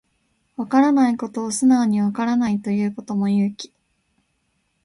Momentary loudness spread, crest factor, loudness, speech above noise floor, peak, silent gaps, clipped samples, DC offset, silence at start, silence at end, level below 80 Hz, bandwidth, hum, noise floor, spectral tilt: 13 LU; 18 dB; -20 LUFS; 50 dB; -4 dBFS; none; under 0.1%; under 0.1%; 0.6 s; 1.2 s; -64 dBFS; 11.5 kHz; none; -69 dBFS; -6 dB/octave